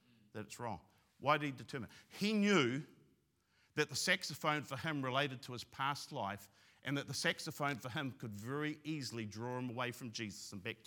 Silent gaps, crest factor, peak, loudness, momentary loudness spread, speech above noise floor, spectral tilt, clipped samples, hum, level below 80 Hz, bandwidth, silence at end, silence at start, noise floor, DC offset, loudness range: none; 24 dB; -16 dBFS; -39 LUFS; 13 LU; 37 dB; -4 dB/octave; under 0.1%; none; -82 dBFS; 18 kHz; 0.1 s; 0.35 s; -76 dBFS; under 0.1%; 4 LU